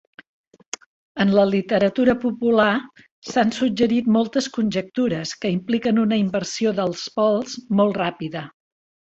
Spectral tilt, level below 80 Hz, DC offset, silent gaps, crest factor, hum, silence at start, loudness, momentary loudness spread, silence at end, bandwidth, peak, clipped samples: -5.5 dB/octave; -58 dBFS; under 0.1%; 3.11-3.22 s; 18 dB; none; 1.15 s; -21 LUFS; 13 LU; 0.55 s; 8 kHz; -4 dBFS; under 0.1%